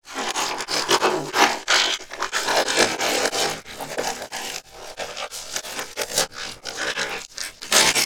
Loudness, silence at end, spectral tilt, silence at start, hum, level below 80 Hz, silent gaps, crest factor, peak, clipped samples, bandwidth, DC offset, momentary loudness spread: -22 LUFS; 0 s; -0.5 dB/octave; 0.05 s; none; -54 dBFS; none; 24 dB; 0 dBFS; under 0.1%; over 20 kHz; 0.2%; 13 LU